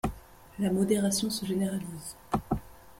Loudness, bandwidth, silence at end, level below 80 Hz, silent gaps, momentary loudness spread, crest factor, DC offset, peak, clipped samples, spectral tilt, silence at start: -30 LUFS; 16.5 kHz; 0.05 s; -48 dBFS; none; 12 LU; 18 dB; under 0.1%; -14 dBFS; under 0.1%; -5 dB/octave; 0.05 s